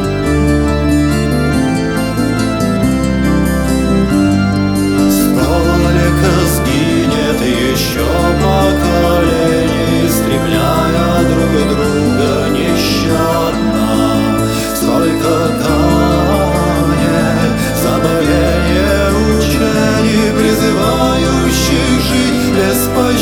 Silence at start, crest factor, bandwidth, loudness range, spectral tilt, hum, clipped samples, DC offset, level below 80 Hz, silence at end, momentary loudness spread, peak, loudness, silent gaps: 0 s; 10 dB; 19 kHz; 1 LU; -5.5 dB/octave; none; under 0.1%; under 0.1%; -22 dBFS; 0 s; 2 LU; 0 dBFS; -12 LUFS; none